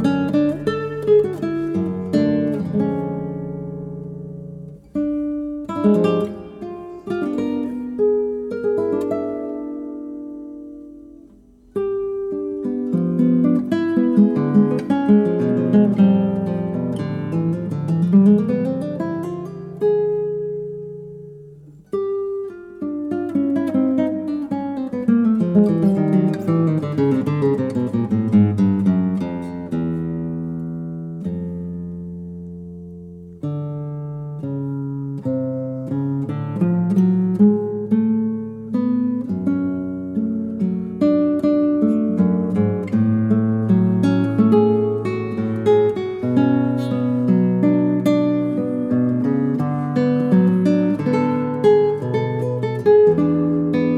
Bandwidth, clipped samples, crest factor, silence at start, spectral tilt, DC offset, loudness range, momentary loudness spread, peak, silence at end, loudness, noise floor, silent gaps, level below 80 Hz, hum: 7.4 kHz; under 0.1%; 16 dB; 0 s; -10 dB/octave; under 0.1%; 9 LU; 14 LU; -4 dBFS; 0 s; -19 LUFS; -48 dBFS; none; -54 dBFS; none